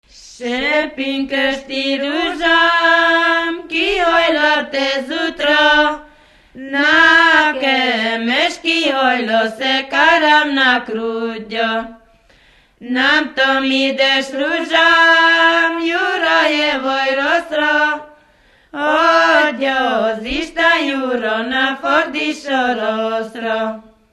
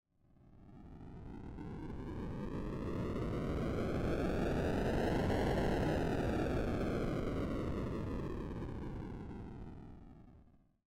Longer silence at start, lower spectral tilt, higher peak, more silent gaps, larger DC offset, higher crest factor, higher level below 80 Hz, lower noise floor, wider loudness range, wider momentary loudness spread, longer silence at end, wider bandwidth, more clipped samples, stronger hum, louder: second, 0.25 s vs 0.45 s; second, -2.5 dB/octave vs -7.5 dB/octave; first, 0 dBFS vs -28 dBFS; neither; neither; first, 16 dB vs 10 dB; about the same, -48 dBFS vs -46 dBFS; second, -51 dBFS vs -66 dBFS; second, 4 LU vs 8 LU; second, 11 LU vs 17 LU; about the same, 0.3 s vs 0.4 s; second, 12.5 kHz vs 16.5 kHz; neither; neither; first, -14 LUFS vs -38 LUFS